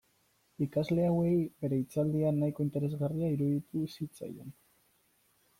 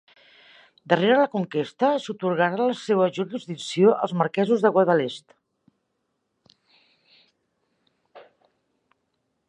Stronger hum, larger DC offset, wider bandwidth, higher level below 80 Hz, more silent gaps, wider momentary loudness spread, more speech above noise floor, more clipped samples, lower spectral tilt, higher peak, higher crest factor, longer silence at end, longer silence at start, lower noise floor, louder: neither; neither; first, 16 kHz vs 10 kHz; first, -64 dBFS vs -76 dBFS; neither; about the same, 12 LU vs 11 LU; second, 40 dB vs 54 dB; neither; first, -9 dB/octave vs -6 dB/octave; second, -20 dBFS vs -4 dBFS; second, 14 dB vs 22 dB; second, 1.1 s vs 1.25 s; second, 0.6 s vs 0.85 s; second, -72 dBFS vs -76 dBFS; second, -32 LUFS vs -22 LUFS